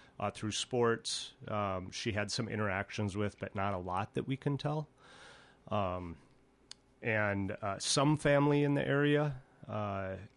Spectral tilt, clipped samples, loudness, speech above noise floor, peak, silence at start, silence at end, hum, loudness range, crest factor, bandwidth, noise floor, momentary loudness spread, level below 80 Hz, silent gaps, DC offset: -5 dB/octave; under 0.1%; -34 LUFS; 25 dB; -16 dBFS; 0.2 s; 0.1 s; none; 7 LU; 18 dB; 11.5 kHz; -59 dBFS; 11 LU; -60 dBFS; none; under 0.1%